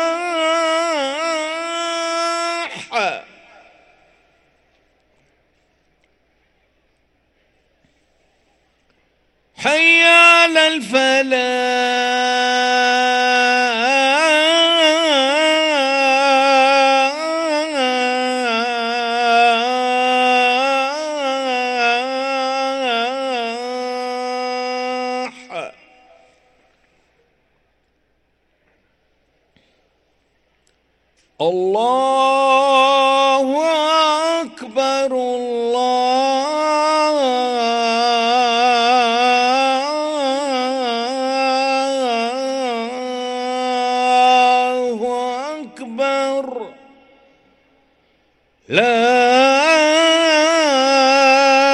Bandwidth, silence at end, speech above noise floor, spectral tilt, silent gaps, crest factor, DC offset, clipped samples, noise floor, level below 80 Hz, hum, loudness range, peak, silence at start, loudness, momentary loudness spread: 12 kHz; 0 s; 47 dB; -1.5 dB/octave; none; 16 dB; under 0.1%; under 0.1%; -64 dBFS; -66 dBFS; none; 12 LU; 0 dBFS; 0 s; -15 LUFS; 10 LU